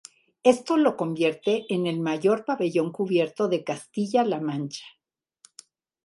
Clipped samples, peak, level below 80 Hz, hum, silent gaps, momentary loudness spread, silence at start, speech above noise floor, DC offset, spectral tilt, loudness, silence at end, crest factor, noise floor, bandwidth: under 0.1%; -6 dBFS; -76 dBFS; none; none; 8 LU; 0.45 s; 35 dB; under 0.1%; -6 dB/octave; -25 LUFS; 1.15 s; 20 dB; -59 dBFS; 11.5 kHz